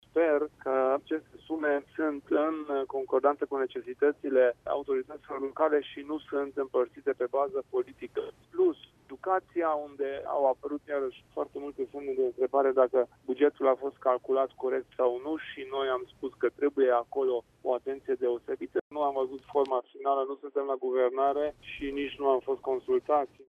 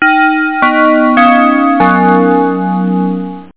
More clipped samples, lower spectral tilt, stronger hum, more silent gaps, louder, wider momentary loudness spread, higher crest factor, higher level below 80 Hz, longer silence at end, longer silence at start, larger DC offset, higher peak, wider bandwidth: neither; second, -6.5 dB/octave vs -10 dB/octave; neither; first, 18.81-18.90 s vs none; second, -30 LUFS vs -9 LUFS; first, 10 LU vs 7 LU; first, 18 dB vs 8 dB; second, -68 dBFS vs -50 dBFS; about the same, 0.05 s vs 0.1 s; first, 0.15 s vs 0 s; second, under 0.1% vs 1%; second, -12 dBFS vs 0 dBFS; first, 4.7 kHz vs 4 kHz